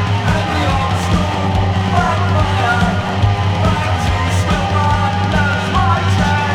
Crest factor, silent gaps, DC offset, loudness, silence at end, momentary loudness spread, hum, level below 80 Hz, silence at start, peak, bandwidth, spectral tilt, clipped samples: 14 dB; none; under 0.1%; -15 LUFS; 0 s; 2 LU; none; -26 dBFS; 0 s; 0 dBFS; 11.5 kHz; -6 dB/octave; under 0.1%